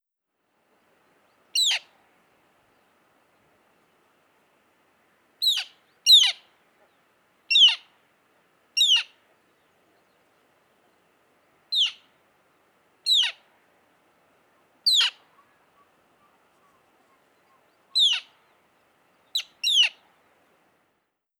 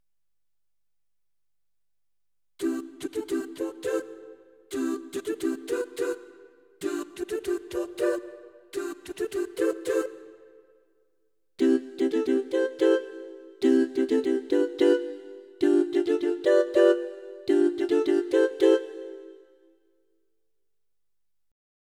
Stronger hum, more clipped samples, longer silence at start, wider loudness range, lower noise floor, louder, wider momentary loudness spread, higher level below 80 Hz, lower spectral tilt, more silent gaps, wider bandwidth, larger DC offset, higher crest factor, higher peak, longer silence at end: neither; neither; second, 1.55 s vs 2.6 s; about the same, 12 LU vs 10 LU; second, -78 dBFS vs -89 dBFS; first, -20 LUFS vs -26 LUFS; about the same, 15 LU vs 15 LU; second, under -90 dBFS vs -70 dBFS; second, 5 dB/octave vs -4 dB/octave; neither; first, 19.5 kHz vs 15 kHz; neither; about the same, 22 dB vs 20 dB; about the same, -6 dBFS vs -8 dBFS; second, 1.5 s vs 2.65 s